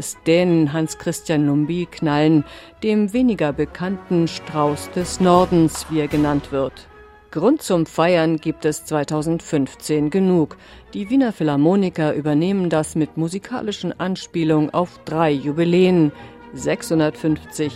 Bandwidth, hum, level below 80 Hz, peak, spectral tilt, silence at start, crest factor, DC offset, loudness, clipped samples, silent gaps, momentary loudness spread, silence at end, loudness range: 15 kHz; none; -48 dBFS; 0 dBFS; -6.5 dB/octave; 0 s; 18 dB; under 0.1%; -19 LUFS; under 0.1%; none; 9 LU; 0 s; 2 LU